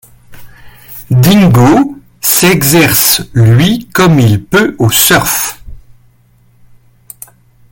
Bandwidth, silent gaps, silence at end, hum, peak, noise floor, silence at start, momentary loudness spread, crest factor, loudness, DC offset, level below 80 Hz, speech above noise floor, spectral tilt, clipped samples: over 20 kHz; none; 1.95 s; none; 0 dBFS; -47 dBFS; 0.3 s; 8 LU; 10 dB; -8 LUFS; under 0.1%; -36 dBFS; 40 dB; -4.5 dB/octave; 0.2%